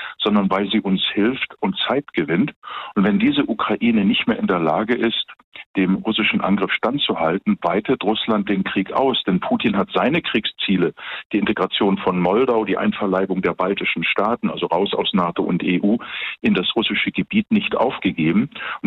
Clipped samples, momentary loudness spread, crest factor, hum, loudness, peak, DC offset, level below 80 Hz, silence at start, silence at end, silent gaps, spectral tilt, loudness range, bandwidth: under 0.1%; 4 LU; 14 dB; none; -19 LUFS; -6 dBFS; under 0.1%; -54 dBFS; 0 s; 0 s; 2.56-2.62 s, 5.44-5.52 s, 5.66-5.74 s, 11.25-11.30 s; -8.5 dB/octave; 1 LU; 4.6 kHz